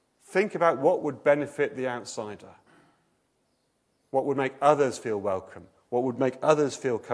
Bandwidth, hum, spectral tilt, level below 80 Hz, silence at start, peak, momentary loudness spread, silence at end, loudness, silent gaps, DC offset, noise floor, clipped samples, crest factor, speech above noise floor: 11 kHz; none; -5.5 dB/octave; -76 dBFS; 0.3 s; -6 dBFS; 11 LU; 0 s; -27 LUFS; none; under 0.1%; -72 dBFS; under 0.1%; 22 dB; 46 dB